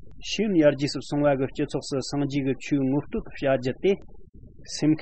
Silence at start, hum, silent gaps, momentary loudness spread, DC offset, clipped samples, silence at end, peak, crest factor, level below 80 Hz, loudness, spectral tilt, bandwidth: 0.05 s; none; 4.29-4.33 s; 9 LU; 0.6%; under 0.1%; 0 s; -8 dBFS; 18 dB; -50 dBFS; -25 LUFS; -6 dB/octave; 8.8 kHz